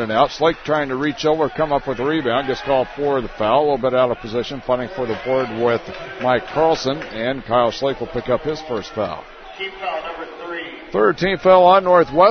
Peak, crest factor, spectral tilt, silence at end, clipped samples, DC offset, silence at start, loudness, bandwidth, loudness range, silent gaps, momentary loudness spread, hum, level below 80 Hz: 0 dBFS; 18 dB; -6 dB/octave; 0 s; under 0.1%; under 0.1%; 0 s; -19 LUFS; 6.6 kHz; 5 LU; none; 13 LU; none; -44 dBFS